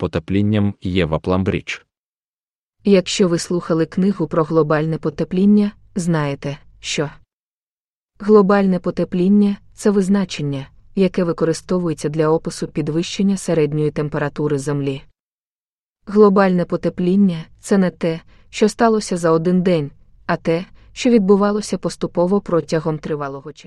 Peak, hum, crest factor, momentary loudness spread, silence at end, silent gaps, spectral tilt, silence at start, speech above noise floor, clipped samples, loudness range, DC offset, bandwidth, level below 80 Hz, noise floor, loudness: 0 dBFS; none; 18 dB; 10 LU; 0.05 s; 1.99-2.71 s, 7.33-8.09 s, 15.20-15.95 s; -6.5 dB/octave; 0 s; over 73 dB; under 0.1%; 3 LU; under 0.1%; 11.5 kHz; -46 dBFS; under -90 dBFS; -18 LUFS